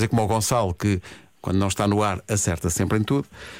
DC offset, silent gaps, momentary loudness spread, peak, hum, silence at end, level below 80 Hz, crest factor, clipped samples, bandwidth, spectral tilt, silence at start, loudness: under 0.1%; none; 5 LU; -10 dBFS; none; 0 s; -44 dBFS; 12 dB; under 0.1%; 16.5 kHz; -5 dB/octave; 0 s; -23 LUFS